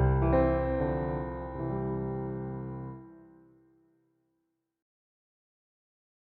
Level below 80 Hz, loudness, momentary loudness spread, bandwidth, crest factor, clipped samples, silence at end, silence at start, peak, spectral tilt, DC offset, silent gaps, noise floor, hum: -40 dBFS; -31 LUFS; 15 LU; 4.2 kHz; 20 dB; under 0.1%; 2.95 s; 0 s; -14 dBFS; -9.5 dB/octave; under 0.1%; none; -81 dBFS; none